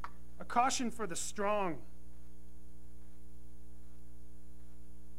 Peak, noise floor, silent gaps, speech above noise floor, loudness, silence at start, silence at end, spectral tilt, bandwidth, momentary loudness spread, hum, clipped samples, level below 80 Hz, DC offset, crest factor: -16 dBFS; -56 dBFS; none; 21 dB; -35 LUFS; 0 s; 0 s; -3.5 dB/octave; 16 kHz; 26 LU; none; under 0.1%; -58 dBFS; 1%; 24 dB